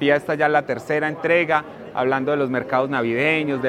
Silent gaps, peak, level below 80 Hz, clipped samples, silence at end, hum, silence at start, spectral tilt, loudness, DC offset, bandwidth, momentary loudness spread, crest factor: none; -2 dBFS; -64 dBFS; under 0.1%; 0 s; none; 0 s; -6.5 dB/octave; -21 LUFS; under 0.1%; 14 kHz; 4 LU; 18 dB